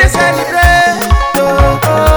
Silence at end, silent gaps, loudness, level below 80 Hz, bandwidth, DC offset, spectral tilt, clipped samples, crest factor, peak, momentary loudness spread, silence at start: 0 s; none; -9 LUFS; -14 dBFS; over 20 kHz; under 0.1%; -4.5 dB/octave; 0.7%; 8 dB; 0 dBFS; 4 LU; 0 s